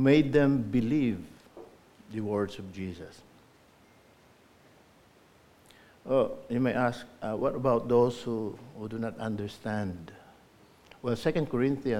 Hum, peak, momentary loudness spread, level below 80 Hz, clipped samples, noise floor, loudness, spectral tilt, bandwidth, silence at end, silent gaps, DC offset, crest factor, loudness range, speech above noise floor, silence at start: none; -10 dBFS; 20 LU; -58 dBFS; under 0.1%; -60 dBFS; -30 LUFS; -7.5 dB/octave; 14.5 kHz; 0 s; none; under 0.1%; 20 dB; 10 LU; 31 dB; 0 s